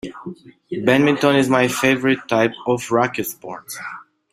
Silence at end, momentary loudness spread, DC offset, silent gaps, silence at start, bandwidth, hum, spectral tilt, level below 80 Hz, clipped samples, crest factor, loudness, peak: 0.3 s; 18 LU; under 0.1%; none; 0.05 s; 16 kHz; none; -5 dB/octave; -58 dBFS; under 0.1%; 18 dB; -18 LUFS; 0 dBFS